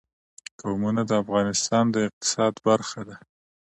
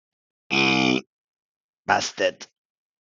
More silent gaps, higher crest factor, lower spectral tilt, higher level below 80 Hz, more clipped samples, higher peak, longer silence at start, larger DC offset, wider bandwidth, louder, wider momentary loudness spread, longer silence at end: second, 2.13-2.21 s vs 1.07-1.83 s; about the same, 20 dB vs 24 dB; about the same, -4.5 dB/octave vs -3.5 dB/octave; first, -60 dBFS vs -72 dBFS; neither; second, -6 dBFS vs -2 dBFS; first, 0.65 s vs 0.5 s; neither; first, 11.5 kHz vs 9.2 kHz; about the same, -24 LUFS vs -22 LUFS; first, 16 LU vs 8 LU; about the same, 0.5 s vs 0.55 s